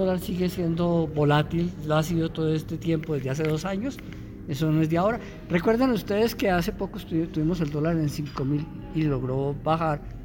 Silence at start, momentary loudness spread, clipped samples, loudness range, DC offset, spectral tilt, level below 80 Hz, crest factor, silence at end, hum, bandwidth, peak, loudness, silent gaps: 0 s; 8 LU; under 0.1%; 2 LU; under 0.1%; -7 dB/octave; -44 dBFS; 16 dB; 0 s; none; 17 kHz; -10 dBFS; -26 LUFS; none